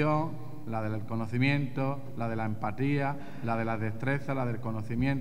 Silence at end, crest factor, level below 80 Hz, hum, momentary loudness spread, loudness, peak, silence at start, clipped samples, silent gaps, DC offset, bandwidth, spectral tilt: 0 s; 18 dB; -58 dBFS; none; 7 LU; -32 LUFS; -14 dBFS; 0 s; under 0.1%; none; 1%; 14 kHz; -8.5 dB/octave